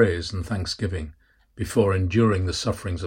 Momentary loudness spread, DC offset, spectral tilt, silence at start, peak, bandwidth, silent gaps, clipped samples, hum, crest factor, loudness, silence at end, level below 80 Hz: 11 LU; under 0.1%; -6 dB/octave; 0 s; -6 dBFS; 16.5 kHz; none; under 0.1%; none; 18 dB; -24 LUFS; 0 s; -42 dBFS